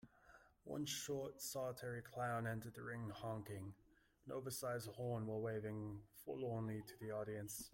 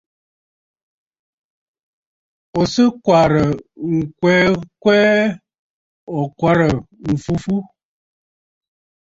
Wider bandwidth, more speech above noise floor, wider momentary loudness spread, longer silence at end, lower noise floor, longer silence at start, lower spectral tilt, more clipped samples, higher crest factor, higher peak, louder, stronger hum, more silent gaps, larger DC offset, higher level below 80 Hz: first, 16.5 kHz vs 8 kHz; second, 22 dB vs over 74 dB; about the same, 10 LU vs 11 LU; second, 0.05 s vs 1.45 s; second, -69 dBFS vs under -90 dBFS; second, 0.05 s vs 2.55 s; second, -5 dB/octave vs -6.5 dB/octave; neither; about the same, 16 dB vs 18 dB; second, -32 dBFS vs -2 dBFS; second, -47 LUFS vs -17 LUFS; neither; second, none vs 5.59-6.07 s; neither; second, -74 dBFS vs -46 dBFS